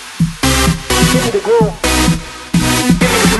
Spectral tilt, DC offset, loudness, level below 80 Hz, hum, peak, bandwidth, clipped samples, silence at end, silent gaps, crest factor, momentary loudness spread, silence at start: -4 dB/octave; under 0.1%; -12 LUFS; -24 dBFS; none; 0 dBFS; 12.5 kHz; under 0.1%; 0 s; none; 12 dB; 5 LU; 0 s